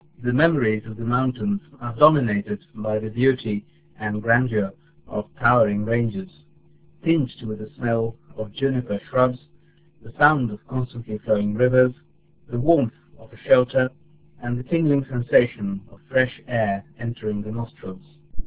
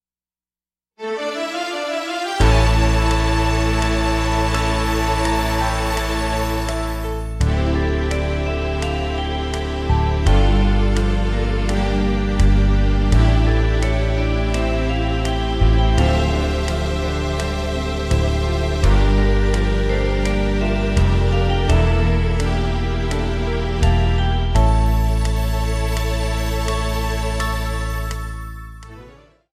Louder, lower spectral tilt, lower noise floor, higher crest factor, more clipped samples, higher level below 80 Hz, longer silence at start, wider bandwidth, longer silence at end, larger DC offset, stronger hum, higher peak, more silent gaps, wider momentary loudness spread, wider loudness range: second, -23 LUFS vs -19 LUFS; first, -11.5 dB/octave vs -6 dB/octave; second, -56 dBFS vs under -90 dBFS; first, 22 dB vs 16 dB; neither; second, -48 dBFS vs -20 dBFS; second, 0.2 s vs 1 s; second, 4 kHz vs 14 kHz; second, 0 s vs 0.45 s; first, 0.4% vs under 0.1%; neither; about the same, 0 dBFS vs -2 dBFS; neither; first, 13 LU vs 7 LU; about the same, 3 LU vs 3 LU